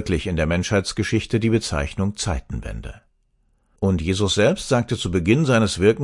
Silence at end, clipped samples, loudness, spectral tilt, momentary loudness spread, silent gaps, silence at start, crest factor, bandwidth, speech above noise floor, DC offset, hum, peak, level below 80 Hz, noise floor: 0 s; under 0.1%; -21 LUFS; -5.5 dB/octave; 11 LU; none; 0 s; 18 dB; 11.5 kHz; 43 dB; under 0.1%; none; -2 dBFS; -38 dBFS; -64 dBFS